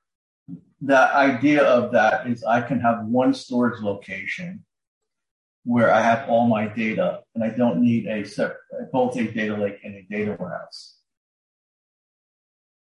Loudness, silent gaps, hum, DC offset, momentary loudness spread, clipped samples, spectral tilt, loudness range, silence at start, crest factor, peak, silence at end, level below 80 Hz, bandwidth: -21 LUFS; 4.87-5.01 s, 5.31-5.62 s; none; under 0.1%; 14 LU; under 0.1%; -6.5 dB/octave; 9 LU; 0.5 s; 18 dB; -6 dBFS; 1.95 s; -64 dBFS; 10.5 kHz